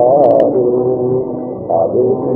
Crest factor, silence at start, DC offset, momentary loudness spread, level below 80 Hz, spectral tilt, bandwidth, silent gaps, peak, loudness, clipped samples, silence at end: 12 dB; 0 s; under 0.1%; 9 LU; -50 dBFS; -11.5 dB/octave; 3.3 kHz; none; 0 dBFS; -13 LUFS; under 0.1%; 0 s